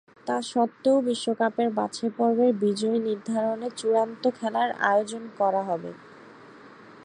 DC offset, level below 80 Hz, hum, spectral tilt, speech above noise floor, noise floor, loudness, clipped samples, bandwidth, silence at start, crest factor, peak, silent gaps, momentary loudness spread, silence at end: under 0.1%; -78 dBFS; none; -5 dB/octave; 23 dB; -48 dBFS; -26 LUFS; under 0.1%; 10.5 kHz; 0.25 s; 20 dB; -6 dBFS; none; 8 LU; 0 s